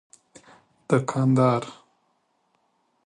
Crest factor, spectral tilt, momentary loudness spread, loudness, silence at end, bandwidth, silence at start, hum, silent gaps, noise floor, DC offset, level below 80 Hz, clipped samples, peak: 20 dB; -7.5 dB/octave; 8 LU; -23 LUFS; 1.35 s; 10 kHz; 0.9 s; none; none; -70 dBFS; under 0.1%; -66 dBFS; under 0.1%; -6 dBFS